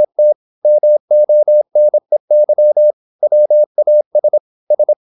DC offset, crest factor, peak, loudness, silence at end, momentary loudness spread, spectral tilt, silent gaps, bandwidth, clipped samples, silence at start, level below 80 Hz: under 0.1%; 6 dB; -4 dBFS; -12 LUFS; 0.05 s; 6 LU; -11 dB/octave; 0.35-0.62 s, 1.00-1.08 s, 2.20-2.28 s, 2.93-3.19 s, 3.66-3.75 s, 4.06-4.11 s, 4.40-4.67 s; 0.9 kHz; under 0.1%; 0 s; -82 dBFS